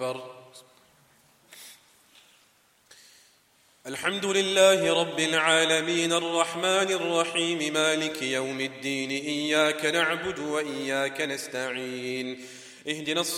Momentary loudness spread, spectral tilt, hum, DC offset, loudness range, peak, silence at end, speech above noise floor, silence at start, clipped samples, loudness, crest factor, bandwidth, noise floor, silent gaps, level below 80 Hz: 15 LU; -2.5 dB/octave; none; under 0.1%; 7 LU; -6 dBFS; 0 s; 37 dB; 0 s; under 0.1%; -25 LUFS; 22 dB; 16 kHz; -63 dBFS; none; -74 dBFS